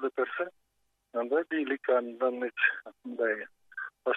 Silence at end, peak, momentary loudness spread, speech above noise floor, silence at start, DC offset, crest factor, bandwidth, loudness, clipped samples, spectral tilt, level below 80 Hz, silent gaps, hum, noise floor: 0 s; -12 dBFS; 13 LU; 46 dB; 0 s; under 0.1%; 20 dB; 4.1 kHz; -31 LUFS; under 0.1%; -5.5 dB/octave; -86 dBFS; none; none; -77 dBFS